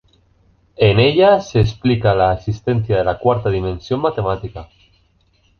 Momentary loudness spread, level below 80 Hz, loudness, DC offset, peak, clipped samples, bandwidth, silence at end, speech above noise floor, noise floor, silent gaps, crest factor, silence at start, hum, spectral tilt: 10 LU; -36 dBFS; -16 LUFS; under 0.1%; 0 dBFS; under 0.1%; 6.6 kHz; 0.95 s; 42 dB; -58 dBFS; none; 16 dB; 0.8 s; none; -7.5 dB/octave